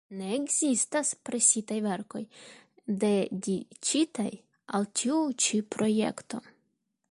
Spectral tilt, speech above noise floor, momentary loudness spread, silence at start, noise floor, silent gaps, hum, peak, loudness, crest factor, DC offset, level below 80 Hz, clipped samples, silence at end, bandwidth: -3.5 dB/octave; 48 dB; 15 LU; 0.1 s; -77 dBFS; none; none; -8 dBFS; -28 LUFS; 22 dB; under 0.1%; -74 dBFS; under 0.1%; 0.7 s; 11.5 kHz